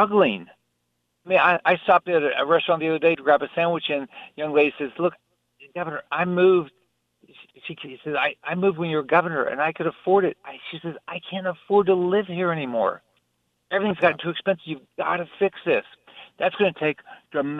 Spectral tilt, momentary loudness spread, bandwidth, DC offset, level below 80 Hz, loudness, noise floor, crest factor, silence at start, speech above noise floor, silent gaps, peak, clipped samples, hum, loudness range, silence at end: -8 dB/octave; 15 LU; 5 kHz; under 0.1%; -70 dBFS; -22 LUFS; -74 dBFS; 18 dB; 0 s; 52 dB; none; -4 dBFS; under 0.1%; none; 5 LU; 0 s